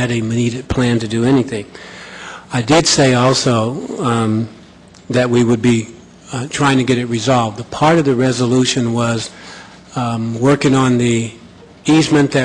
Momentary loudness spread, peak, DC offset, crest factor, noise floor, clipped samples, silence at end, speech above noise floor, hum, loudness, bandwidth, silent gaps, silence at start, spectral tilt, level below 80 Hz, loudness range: 16 LU; -2 dBFS; under 0.1%; 14 dB; -41 dBFS; under 0.1%; 0 s; 27 dB; none; -15 LUFS; 11 kHz; none; 0 s; -5 dB/octave; -44 dBFS; 2 LU